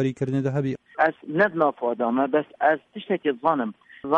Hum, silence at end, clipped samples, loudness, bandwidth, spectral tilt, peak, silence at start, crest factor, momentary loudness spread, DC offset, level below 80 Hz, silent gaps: none; 0 s; under 0.1%; -24 LUFS; 8.4 kHz; -8 dB/octave; -6 dBFS; 0 s; 18 dB; 7 LU; under 0.1%; -66 dBFS; none